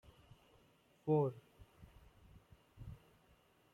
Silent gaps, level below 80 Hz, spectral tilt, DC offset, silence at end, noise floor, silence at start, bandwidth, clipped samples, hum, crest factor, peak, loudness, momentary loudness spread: none; -68 dBFS; -10 dB/octave; under 0.1%; 0.8 s; -71 dBFS; 1.05 s; 11.5 kHz; under 0.1%; none; 22 dB; -24 dBFS; -38 LUFS; 28 LU